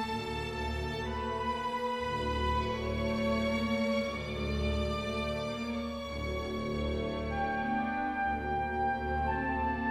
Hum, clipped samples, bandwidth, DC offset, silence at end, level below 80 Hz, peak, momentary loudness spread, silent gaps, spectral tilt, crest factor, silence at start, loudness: none; under 0.1%; 14.5 kHz; under 0.1%; 0 s; -44 dBFS; -20 dBFS; 5 LU; none; -6 dB/octave; 14 dB; 0 s; -33 LUFS